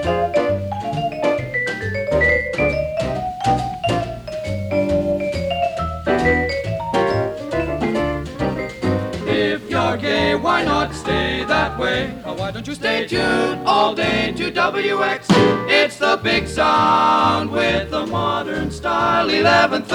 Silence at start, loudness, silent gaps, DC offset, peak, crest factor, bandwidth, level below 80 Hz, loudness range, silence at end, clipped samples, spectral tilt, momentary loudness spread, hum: 0 s; -19 LUFS; none; under 0.1%; -2 dBFS; 16 dB; 19 kHz; -38 dBFS; 5 LU; 0 s; under 0.1%; -5.5 dB/octave; 8 LU; none